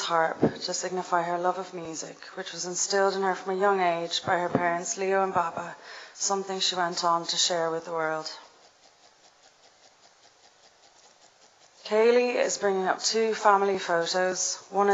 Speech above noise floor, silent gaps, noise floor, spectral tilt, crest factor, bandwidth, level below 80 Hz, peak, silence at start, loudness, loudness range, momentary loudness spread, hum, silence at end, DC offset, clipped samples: 32 dB; none; -58 dBFS; -2.5 dB/octave; 22 dB; 8.2 kHz; -72 dBFS; -6 dBFS; 0 s; -26 LUFS; 6 LU; 13 LU; none; 0 s; under 0.1%; under 0.1%